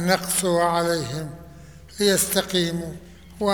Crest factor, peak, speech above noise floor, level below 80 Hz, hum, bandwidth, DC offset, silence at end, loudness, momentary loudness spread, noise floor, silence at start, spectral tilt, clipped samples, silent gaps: 20 dB; -4 dBFS; 21 dB; -50 dBFS; none; over 20 kHz; 0.2%; 0 s; -22 LUFS; 18 LU; -44 dBFS; 0 s; -3.5 dB/octave; under 0.1%; none